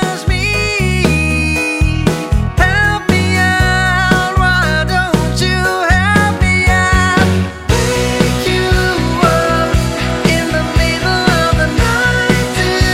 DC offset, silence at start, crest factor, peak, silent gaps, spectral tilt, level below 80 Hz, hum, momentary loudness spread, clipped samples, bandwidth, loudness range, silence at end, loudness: under 0.1%; 0 s; 12 dB; 0 dBFS; none; -5 dB/octave; -20 dBFS; none; 4 LU; under 0.1%; 16.5 kHz; 1 LU; 0 s; -12 LUFS